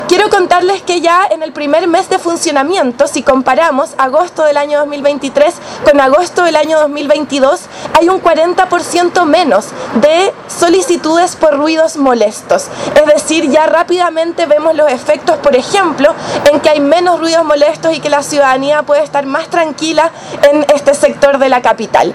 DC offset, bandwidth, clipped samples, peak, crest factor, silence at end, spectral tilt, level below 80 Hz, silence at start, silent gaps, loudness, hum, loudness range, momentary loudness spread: under 0.1%; 13.5 kHz; 0.9%; 0 dBFS; 10 dB; 0 s; -3 dB/octave; -46 dBFS; 0 s; none; -10 LUFS; none; 1 LU; 4 LU